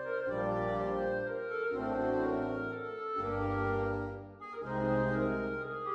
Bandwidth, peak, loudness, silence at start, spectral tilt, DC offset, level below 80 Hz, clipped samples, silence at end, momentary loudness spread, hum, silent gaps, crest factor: 8 kHz; -20 dBFS; -34 LUFS; 0 s; -9 dB/octave; under 0.1%; -54 dBFS; under 0.1%; 0 s; 7 LU; none; none; 14 dB